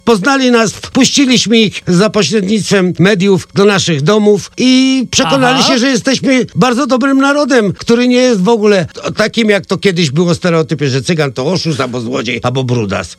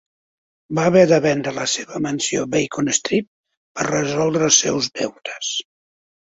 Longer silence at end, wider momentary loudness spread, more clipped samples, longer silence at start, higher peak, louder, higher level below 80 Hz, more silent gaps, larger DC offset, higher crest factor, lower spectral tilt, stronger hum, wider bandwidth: second, 0.05 s vs 0.65 s; second, 6 LU vs 12 LU; first, 0.2% vs under 0.1%; second, 0.05 s vs 0.7 s; about the same, 0 dBFS vs 0 dBFS; first, -10 LUFS vs -19 LUFS; first, -46 dBFS vs -58 dBFS; second, none vs 3.27-3.44 s, 3.57-3.75 s; neither; second, 10 dB vs 20 dB; about the same, -4.5 dB/octave vs -3.5 dB/octave; neither; first, 13.5 kHz vs 8 kHz